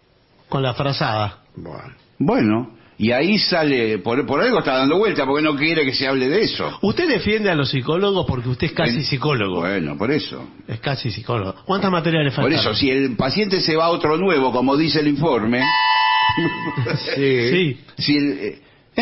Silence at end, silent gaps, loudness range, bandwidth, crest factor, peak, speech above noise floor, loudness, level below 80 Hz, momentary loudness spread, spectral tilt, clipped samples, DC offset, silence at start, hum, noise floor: 0 s; none; 4 LU; 6 kHz; 14 dB; -6 dBFS; 36 dB; -19 LUFS; -48 dBFS; 8 LU; -9 dB/octave; under 0.1%; under 0.1%; 0.5 s; none; -55 dBFS